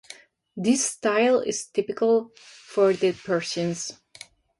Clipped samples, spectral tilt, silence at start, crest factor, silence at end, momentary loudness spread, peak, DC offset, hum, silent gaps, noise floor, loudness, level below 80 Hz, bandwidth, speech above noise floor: under 0.1%; -4 dB/octave; 0.1 s; 16 dB; 0.65 s; 16 LU; -8 dBFS; under 0.1%; none; none; -49 dBFS; -24 LUFS; -68 dBFS; 11.5 kHz; 25 dB